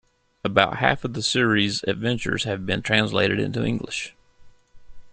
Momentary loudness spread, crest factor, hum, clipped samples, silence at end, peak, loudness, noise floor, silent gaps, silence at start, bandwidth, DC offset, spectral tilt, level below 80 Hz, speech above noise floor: 9 LU; 22 dB; none; under 0.1%; 0 s; -2 dBFS; -23 LUFS; -49 dBFS; none; 0.45 s; 9.8 kHz; under 0.1%; -4.5 dB/octave; -52 dBFS; 26 dB